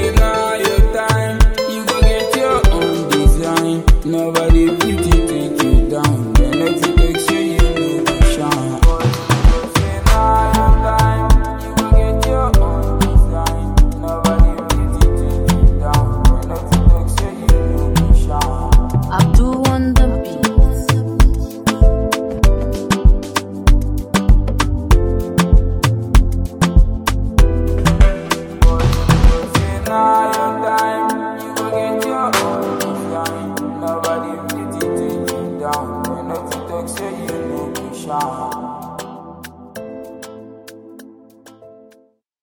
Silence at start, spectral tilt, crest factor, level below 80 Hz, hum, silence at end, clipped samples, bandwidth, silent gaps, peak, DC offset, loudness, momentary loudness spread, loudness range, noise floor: 0 s; -5.5 dB/octave; 14 dB; -16 dBFS; none; 1.4 s; under 0.1%; 18 kHz; none; 0 dBFS; under 0.1%; -16 LUFS; 10 LU; 8 LU; -53 dBFS